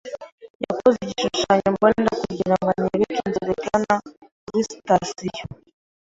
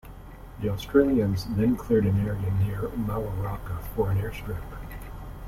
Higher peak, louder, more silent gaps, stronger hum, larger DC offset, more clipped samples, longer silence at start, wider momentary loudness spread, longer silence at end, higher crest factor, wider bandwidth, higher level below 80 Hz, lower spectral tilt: first, -2 dBFS vs -8 dBFS; first, -22 LUFS vs -27 LUFS; first, 0.32-0.38 s, 0.50-0.60 s, 4.17-4.22 s, 4.32-4.47 s vs none; neither; neither; neither; about the same, 0.05 s vs 0.05 s; second, 12 LU vs 18 LU; first, 0.55 s vs 0 s; about the same, 20 dB vs 18 dB; second, 8 kHz vs 16 kHz; second, -52 dBFS vs -40 dBFS; second, -5 dB/octave vs -8 dB/octave